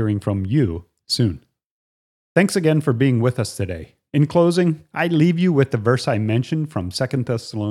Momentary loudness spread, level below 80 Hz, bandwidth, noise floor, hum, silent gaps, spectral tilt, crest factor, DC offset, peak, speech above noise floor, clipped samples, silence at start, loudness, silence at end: 9 LU; -50 dBFS; 13.5 kHz; under -90 dBFS; none; 1.66-2.35 s; -6.5 dB/octave; 18 dB; under 0.1%; -2 dBFS; over 71 dB; under 0.1%; 0 s; -20 LUFS; 0 s